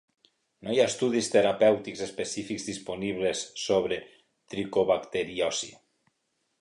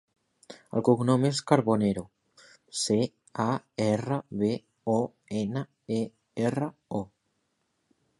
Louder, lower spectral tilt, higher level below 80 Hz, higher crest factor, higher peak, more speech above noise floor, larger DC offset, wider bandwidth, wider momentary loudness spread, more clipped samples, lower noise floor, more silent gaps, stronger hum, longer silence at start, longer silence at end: about the same, -28 LUFS vs -29 LUFS; second, -3.5 dB/octave vs -6 dB/octave; about the same, -64 dBFS vs -64 dBFS; second, 18 dB vs 24 dB; second, -10 dBFS vs -6 dBFS; about the same, 50 dB vs 49 dB; neither; about the same, 11.5 kHz vs 11.5 kHz; about the same, 12 LU vs 11 LU; neither; about the same, -77 dBFS vs -76 dBFS; neither; neither; about the same, 0.6 s vs 0.5 s; second, 0.9 s vs 1.15 s